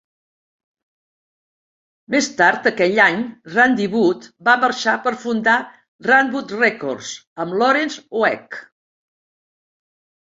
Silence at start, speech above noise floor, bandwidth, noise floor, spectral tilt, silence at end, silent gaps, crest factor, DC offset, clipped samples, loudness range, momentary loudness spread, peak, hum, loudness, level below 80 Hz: 2.1 s; over 72 dB; 8 kHz; under -90 dBFS; -4 dB/octave; 1.65 s; 5.88-5.99 s, 7.27-7.36 s; 18 dB; under 0.1%; under 0.1%; 5 LU; 12 LU; -2 dBFS; none; -17 LUFS; -66 dBFS